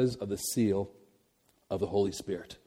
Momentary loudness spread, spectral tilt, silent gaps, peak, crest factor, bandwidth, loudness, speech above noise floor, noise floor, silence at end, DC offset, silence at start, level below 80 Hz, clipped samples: 10 LU; -5.5 dB/octave; none; -16 dBFS; 16 dB; 17 kHz; -32 LUFS; 39 dB; -70 dBFS; 0.1 s; under 0.1%; 0 s; -62 dBFS; under 0.1%